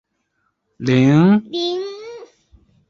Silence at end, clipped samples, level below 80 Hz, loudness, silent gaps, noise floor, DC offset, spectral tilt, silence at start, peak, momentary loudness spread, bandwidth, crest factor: 0.65 s; under 0.1%; -56 dBFS; -16 LUFS; none; -69 dBFS; under 0.1%; -7.5 dB/octave; 0.8 s; -2 dBFS; 20 LU; 7.4 kHz; 16 dB